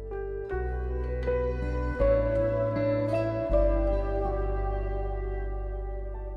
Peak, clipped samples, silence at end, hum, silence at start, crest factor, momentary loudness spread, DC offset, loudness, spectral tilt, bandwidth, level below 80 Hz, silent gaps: -14 dBFS; under 0.1%; 0 s; none; 0 s; 14 dB; 10 LU; under 0.1%; -30 LUFS; -9.5 dB/octave; 5.6 kHz; -32 dBFS; none